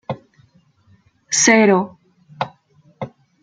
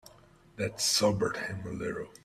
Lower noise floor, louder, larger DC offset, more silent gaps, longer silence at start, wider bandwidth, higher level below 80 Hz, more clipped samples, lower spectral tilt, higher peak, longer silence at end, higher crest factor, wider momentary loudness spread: about the same, -55 dBFS vs -58 dBFS; first, -16 LUFS vs -30 LUFS; neither; neither; about the same, 0.1 s vs 0.05 s; second, 10 kHz vs 16 kHz; about the same, -64 dBFS vs -60 dBFS; neither; about the same, -3 dB/octave vs -3 dB/octave; first, 0 dBFS vs -14 dBFS; first, 0.35 s vs 0.15 s; about the same, 20 dB vs 18 dB; first, 22 LU vs 11 LU